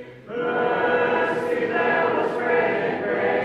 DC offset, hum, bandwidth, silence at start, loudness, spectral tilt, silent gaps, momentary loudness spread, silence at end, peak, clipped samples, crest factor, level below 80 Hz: under 0.1%; none; 8.6 kHz; 0 s; -22 LUFS; -6.5 dB/octave; none; 4 LU; 0 s; -10 dBFS; under 0.1%; 12 dB; -62 dBFS